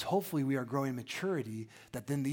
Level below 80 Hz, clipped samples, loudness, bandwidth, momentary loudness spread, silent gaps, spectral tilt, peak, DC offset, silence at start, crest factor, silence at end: -70 dBFS; under 0.1%; -36 LUFS; 17 kHz; 12 LU; none; -6 dB/octave; -18 dBFS; under 0.1%; 0 s; 16 dB; 0 s